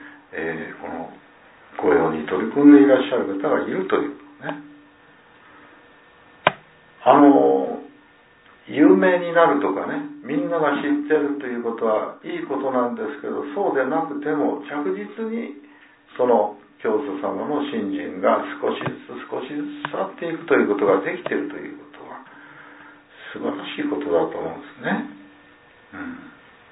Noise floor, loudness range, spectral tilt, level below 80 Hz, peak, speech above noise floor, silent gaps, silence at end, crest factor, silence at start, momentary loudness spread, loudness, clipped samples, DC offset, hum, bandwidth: -52 dBFS; 9 LU; -10 dB/octave; -66 dBFS; 0 dBFS; 32 dB; none; 0.4 s; 22 dB; 0 s; 19 LU; -21 LUFS; under 0.1%; under 0.1%; none; 4 kHz